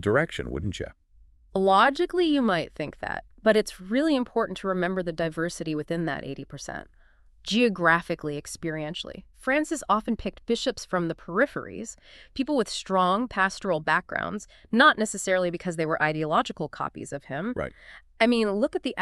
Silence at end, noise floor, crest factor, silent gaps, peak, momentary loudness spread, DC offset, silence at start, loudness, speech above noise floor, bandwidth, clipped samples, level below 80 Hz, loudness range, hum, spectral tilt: 0 s; -56 dBFS; 22 dB; none; -4 dBFS; 14 LU; under 0.1%; 0 s; -26 LUFS; 30 dB; 13 kHz; under 0.1%; -52 dBFS; 4 LU; none; -4.5 dB/octave